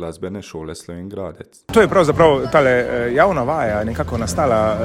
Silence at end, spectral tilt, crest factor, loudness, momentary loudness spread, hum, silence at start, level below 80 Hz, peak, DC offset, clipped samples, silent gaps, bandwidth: 0 s; -6 dB/octave; 16 dB; -16 LUFS; 18 LU; none; 0 s; -38 dBFS; 0 dBFS; under 0.1%; under 0.1%; none; 16 kHz